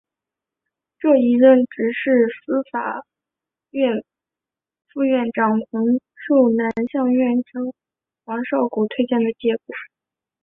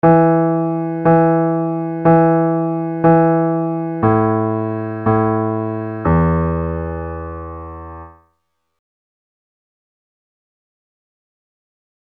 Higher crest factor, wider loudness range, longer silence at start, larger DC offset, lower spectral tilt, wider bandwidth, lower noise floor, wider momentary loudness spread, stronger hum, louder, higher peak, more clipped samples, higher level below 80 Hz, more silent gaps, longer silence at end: about the same, 18 dB vs 16 dB; second, 5 LU vs 15 LU; first, 1 s vs 0.05 s; neither; second, -9 dB/octave vs -12.5 dB/octave; first, 3.8 kHz vs 3.3 kHz; first, -89 dBFS vs -70 dBFS; about the same, 13 LU vs 15 LU; neither; second, -19 LUFS vs -16 LUFS; about the same, -2 dBFS vs -2 dBFS; neither; second, -66 dBFS vs -38 dBFS; neither; second, 0.55 s vs 3.95 s